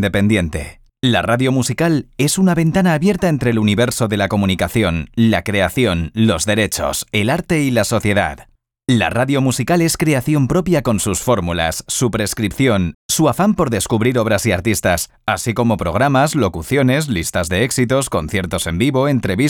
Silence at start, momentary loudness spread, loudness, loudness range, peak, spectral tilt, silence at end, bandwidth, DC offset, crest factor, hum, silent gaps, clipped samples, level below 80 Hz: 0 s; 4 LU; -16 LUFS; 1 LU; -2 dBFS; -5 dB/octave; 0 s; 19.5 kHz; under 0.1%; 12 dB; none; 12.94-13.09 s; under 0.1%; -40 dBFS